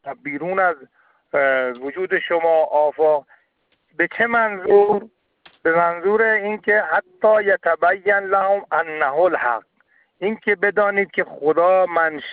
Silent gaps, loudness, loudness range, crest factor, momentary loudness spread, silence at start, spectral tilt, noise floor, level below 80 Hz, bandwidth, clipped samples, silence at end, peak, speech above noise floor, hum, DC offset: none; -19 LUFS; 2 LU; 16 dB; 8 LU; 0.05 s; -9.5 dB/octave; -66 dBFS; -66 dBFS; 4.7 kHz; under 0.1%; 0 s; -4 dBFS; 48 dB; none; under 0.1%